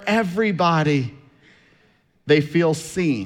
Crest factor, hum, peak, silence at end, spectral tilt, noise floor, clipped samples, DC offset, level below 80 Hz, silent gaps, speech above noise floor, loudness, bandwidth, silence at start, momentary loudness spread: 16 dB; none; -4 dBFS; 0 s; -6 dB/octave; -60 dBFS; under 0.1%; under 0.1%; -58 dBFS; none; 41 dB; -20 LUFS; 15 kHz; 0 s; 6 LU